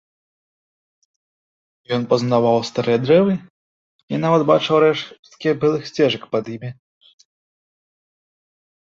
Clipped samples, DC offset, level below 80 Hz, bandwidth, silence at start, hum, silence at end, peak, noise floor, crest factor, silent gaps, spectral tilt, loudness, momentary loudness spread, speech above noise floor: under 0.1%; under 0.1%; -62 dBFS; 7.6 kHz; 1.9 s; none; 2.25 s; -2 dBFS; under -90 dBFS; 18 dB; 3.50-4.08 s, 5.19-5.23 s; -6.5 dB/octave; -18 LUFS; 12 LU; over 72 dB